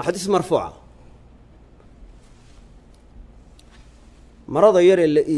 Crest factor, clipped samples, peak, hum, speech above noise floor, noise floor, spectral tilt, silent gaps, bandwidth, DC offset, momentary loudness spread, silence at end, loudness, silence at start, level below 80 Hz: 20 dB; under 0.1%; -2 dBFS; none; 31 dB; -48 dBFS; -6 dB/octave; none; 12 kHz; under 0.1%; 12 LU; 0 s; -17 LUFS; 0 s; -48 dBFS